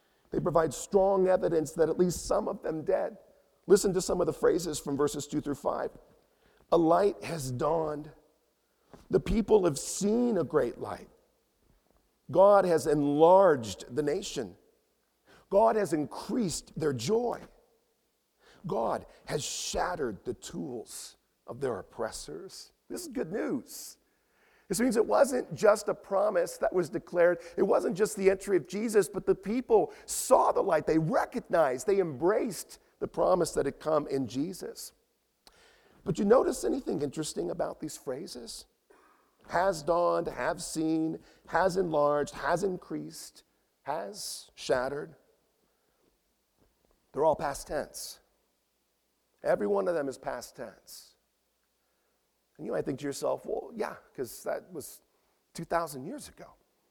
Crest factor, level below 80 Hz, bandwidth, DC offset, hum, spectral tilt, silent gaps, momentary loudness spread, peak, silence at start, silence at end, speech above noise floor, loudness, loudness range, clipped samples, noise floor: 22 dB; -56 dBFS; 18.5 kHz; under 0.1%; none; -5 dB/octave; none; 17 LU; -8 dBFS; 0.3 s; 0.45 s; 47 dB; -29 LUFS; 10 LU; under 0.1%; -76 dBFS